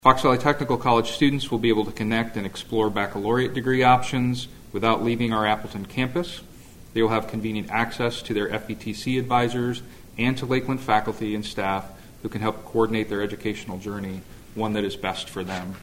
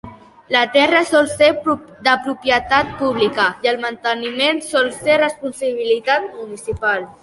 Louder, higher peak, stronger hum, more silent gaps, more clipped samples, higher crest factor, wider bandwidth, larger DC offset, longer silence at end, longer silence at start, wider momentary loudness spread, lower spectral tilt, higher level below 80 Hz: second, -24 LUFS vs -17 LUFS; about the same, 0 dBFS vs 0 dBFS; neither; neither; neither; first, 24 dB vs 16 dB; first, 16.5 kHz vs 11.5 kHz; neither; about the same, 0 s vs 0.1 s; about the same, 0.05 s vs 0.05 s; first, 11 LU vs 8 LU; first, -6 dB/octave vs -3.5 dB/octave; about the same, -48 dBFS vs -48 dBFS